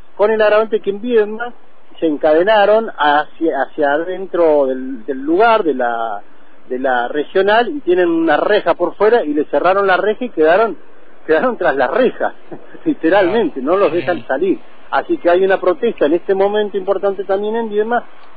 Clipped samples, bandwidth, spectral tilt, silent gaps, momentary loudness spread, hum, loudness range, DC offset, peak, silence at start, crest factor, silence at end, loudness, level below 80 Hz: under 0.1%; 5 kHz; -8.5 dB/octave; none; 9 LU; none; 2 LU; 4%; -2 dBFS; 0.2 s; 12 dB; 0.35 s; -15 LUFS; -52 dBFS